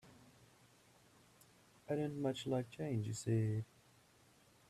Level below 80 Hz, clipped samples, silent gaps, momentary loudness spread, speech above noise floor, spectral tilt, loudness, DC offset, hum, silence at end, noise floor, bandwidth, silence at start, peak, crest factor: -74 dBFS; under 0.1%; none; 7 LU; 30 dB; -6.5 dB/octave; -40 LUFS; under 0.1%; none; 1.05 s; -69 dBFS; 13.5 kHz; 0.05 s; -26 dBFS; 18 dB